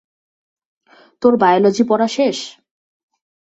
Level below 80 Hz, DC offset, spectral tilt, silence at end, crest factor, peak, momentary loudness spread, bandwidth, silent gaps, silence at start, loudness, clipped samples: -64 dBFS; under 0.1%; -5 dB/octave; 0.95 s; 16 dB; -2 dBFS; 11 LU; 8.2 kHz; none; 1.2 s; -15 LUFS; under 0.1%